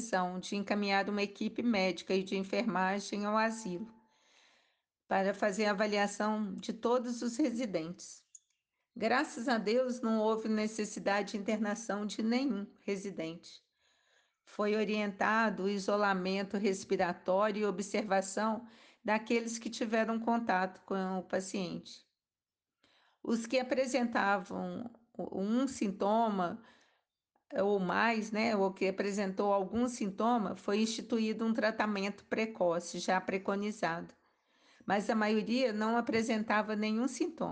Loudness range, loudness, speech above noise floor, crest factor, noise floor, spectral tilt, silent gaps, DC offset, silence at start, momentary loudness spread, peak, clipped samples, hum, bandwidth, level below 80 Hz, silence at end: 3 LU; -34 LUFS; over 57 dB; 18 dB; under -90 dBFS; -5 dB/octave; none; under 0.1%; 0 s; 8 LU; -16 dBFS; under 0.1%; none; 9.8 kHz; -74 dBFS; 0 s